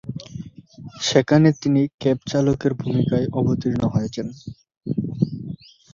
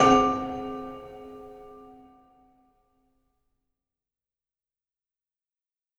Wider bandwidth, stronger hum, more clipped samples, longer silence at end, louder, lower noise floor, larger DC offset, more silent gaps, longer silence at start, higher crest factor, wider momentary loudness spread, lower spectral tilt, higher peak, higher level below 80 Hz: second, 7.6 kHz vs 11.5 kHz; neither; neither; second, 0.4 s vs 4.2 s; first, -21 LUFS vs -26 LUFS; second, -41 dBFS vs -90 dBFS; neither; first, 1.94-1.98 s vs none; about the same, 0.05 s vs 0 s; about the same, 20 dB vs 24 dB; second, 21 LU vs 26 LU; first, -6.5 dB/octave vs -5 dB/octave; first, -2 dBFS vs -6 dBFS; about the same, -50 dBFS vs -54 dBFS